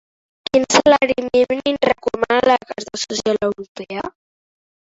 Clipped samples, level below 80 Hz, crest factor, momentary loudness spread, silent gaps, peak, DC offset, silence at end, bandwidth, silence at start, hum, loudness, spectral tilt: under 0.1%; -52 dBFS; 18 dB; 15 LU; 3.68-3.75 s; 0 dBFS; under 0.1%; 0.75 s; 8 kHz; 0.55 s; none; -17 LUFS; -3 dB/octave